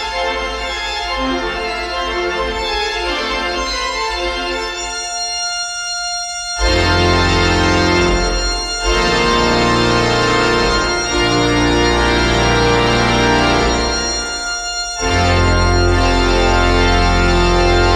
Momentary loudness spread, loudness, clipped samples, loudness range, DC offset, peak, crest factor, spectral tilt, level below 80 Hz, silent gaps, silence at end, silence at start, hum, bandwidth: 7 LU; -15 LUFS; under 0.1%; 5 LU; under 0.1%; 0 dBFS; 14 dB; -4 dB/octave; -24 dBFS; none; 0 s; 0 s; none; 13.5 kHz